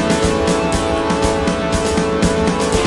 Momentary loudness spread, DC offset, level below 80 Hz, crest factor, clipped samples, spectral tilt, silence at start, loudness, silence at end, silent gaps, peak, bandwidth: 2 LU; under 0.1%; -28 dBFS; 14 dB; under 0.1%; -5 dB/octave; 0 s; -16 LUFS; 0 s; none; -2 dBFS; 11.5 kHz